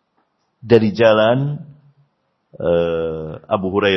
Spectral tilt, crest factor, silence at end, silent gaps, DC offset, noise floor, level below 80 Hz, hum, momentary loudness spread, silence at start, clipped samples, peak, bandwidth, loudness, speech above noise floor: -8 dB/octave; 18 dB; 0 s; none; under 0.1%; -66 dBFS; -50 dBFS; none; 12 LU; 0.65 s; under 0.1%; 0 dBFS; 6.2 kHz; -17 LUFS; 50 dB